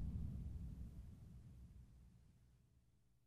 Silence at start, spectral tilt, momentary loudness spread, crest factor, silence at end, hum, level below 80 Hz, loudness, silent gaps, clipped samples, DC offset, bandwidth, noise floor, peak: 0 s; -9 dB/octave; 17 LU; 18 dB; 0.3 s; none; -56 dBFS; -54 LUFS; none; under 0.1%; under 0.1%; 12.5 kHz; -76 dBFS; -36 dBFS